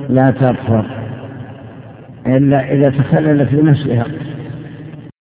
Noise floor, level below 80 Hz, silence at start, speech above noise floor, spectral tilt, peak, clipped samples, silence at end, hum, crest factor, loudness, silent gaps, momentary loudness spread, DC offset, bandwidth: -34 dBFS; -44 dBFS; 0 s; 22 dB; -12.5 dB/octave; 0 dBFS; under 0.1%; 0.1 s; none; 14 dB; -14 LUFS; none; 20 LU; under 0.1%; 4 kHz